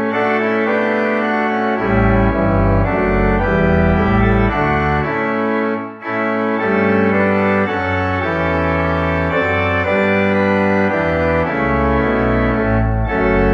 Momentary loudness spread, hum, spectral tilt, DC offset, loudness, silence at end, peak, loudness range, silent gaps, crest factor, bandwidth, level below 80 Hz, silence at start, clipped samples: 3 LU; none; -8.5 dB/octave; under 0.1%; -16 LUFS; 0 s; -2 dBFS; 2 LU; none; 14 dB; 7 kHz; -26 dBFS; 0 s; under 0.1%